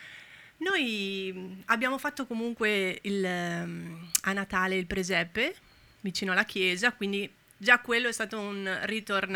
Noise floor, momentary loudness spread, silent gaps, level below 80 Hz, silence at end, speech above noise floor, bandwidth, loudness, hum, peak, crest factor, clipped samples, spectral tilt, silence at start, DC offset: -51 dBFS; 10 LU; none; -60 dBFS; 0 s; 21 dB; over 20 kHz; -29 LUFS; none; -4 dBFS; 26 dB; under 0.1%; -3 dB/octave; 0 s; under 0.1%